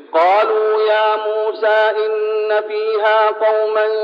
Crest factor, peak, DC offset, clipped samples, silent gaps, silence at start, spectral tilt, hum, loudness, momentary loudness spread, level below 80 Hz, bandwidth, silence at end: 12 dB; -4 dBFS; under 0.1%; under 0.1%; none; 0 s; -2.5 dB/octave; none; -15 LUFS; 5 LU; -80 dBFS; 5.4 kHz; 0 s